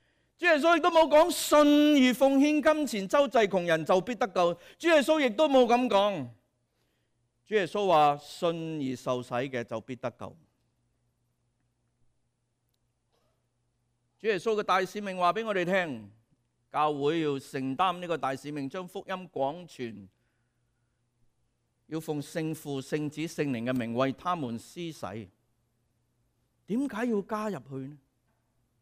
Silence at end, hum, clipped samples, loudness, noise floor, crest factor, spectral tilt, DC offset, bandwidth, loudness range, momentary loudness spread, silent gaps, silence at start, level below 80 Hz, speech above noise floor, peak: 0.85 s; none; under 0.1%; -27 LUFS; -77 dBFS; 16 dB; -5 dB/octave; under 0.1%; 15.5 kHz; 15 LU; 16 LU; none; 0.4 s; -66 dBFS; 50 dB; -12 dBFS